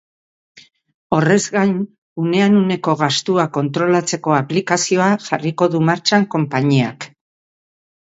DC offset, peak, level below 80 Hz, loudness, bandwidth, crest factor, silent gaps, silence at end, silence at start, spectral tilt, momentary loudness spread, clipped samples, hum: under 0.1%; 0 dBFS; -60 dBFS; -17 LUFS; 8 kHz; 18 dB; 0.94-1.10 s, 1.98-2.16 s; 0.95 s; 0.55 s; -5 dB/octave; 7 LU; under 0.1%; none